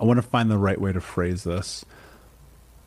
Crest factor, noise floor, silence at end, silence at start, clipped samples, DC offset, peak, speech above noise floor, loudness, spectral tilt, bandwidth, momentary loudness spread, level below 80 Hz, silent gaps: 16 dB; -50 dBFS; 0.8 s; 0 s; under 0.1%; under 0.1%; -8 dBFS; 27 dB; -24 LUFS; -6.5 dB/octave; 14.5 kHz; 10 LU; -48 dBFS; none